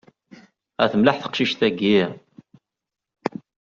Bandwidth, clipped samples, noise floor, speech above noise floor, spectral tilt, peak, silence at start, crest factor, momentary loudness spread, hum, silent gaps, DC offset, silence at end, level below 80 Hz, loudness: 7.4 kHz; under 0.1%; -86 dBFS; 66 dB; -3.5 dB/octave; -2 dBFS; 0.8 s; 20 dB; 13 LU; none; none; under 0.1%; 0.35 s; -62 dBFS; -21 LUFS